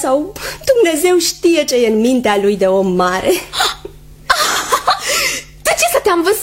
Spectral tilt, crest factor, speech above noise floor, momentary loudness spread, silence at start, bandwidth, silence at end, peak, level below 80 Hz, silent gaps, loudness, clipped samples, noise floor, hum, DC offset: -3 dB/octave; 14 dB; 21 dB; 5 LU; 0 s; 16.5 kHz; 0 s; 0 dBFS; -42 dBFS; none; -14 LUFS; under 0.1%; -34 dBFS; none; under 0.1%